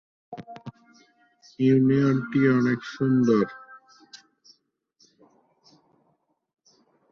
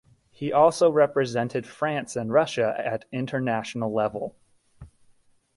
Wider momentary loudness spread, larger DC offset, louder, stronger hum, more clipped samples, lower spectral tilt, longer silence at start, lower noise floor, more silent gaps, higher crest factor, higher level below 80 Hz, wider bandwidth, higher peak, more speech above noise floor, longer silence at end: first, 23 LU vs 10 LU; neither; first, -22 LUFS vs -25 LUFS; neither; neither; first, -8.5 dB/octave vs -5.5 dB/octave; about the same, 0.3 s vs 0.4 s; first, -71 dBFS vs -61 dBFS; neither; about the same, 18 dB vs 20 dB; about the same, -66 dBFS vs -62 dBFS; second, 6.8 kHz vs 11.5 kHz; second, -10 dBFS vs -6 dBFS; first, 49 dB vs 37 dB; first, 2.95 s vs 0.7 s